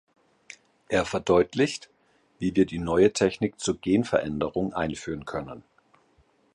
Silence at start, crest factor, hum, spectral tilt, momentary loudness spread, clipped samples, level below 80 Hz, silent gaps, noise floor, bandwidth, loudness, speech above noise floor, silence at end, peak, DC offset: 0.9 s; 20 dB; none; -5.5 dB/octave; 13 LU; under 0.1%; -52 dBFS; none; -64 dBFS; 11.5 kHz; -26 LUFS; 39 dB; 0.95 s; -6 dBFS; under 0.1%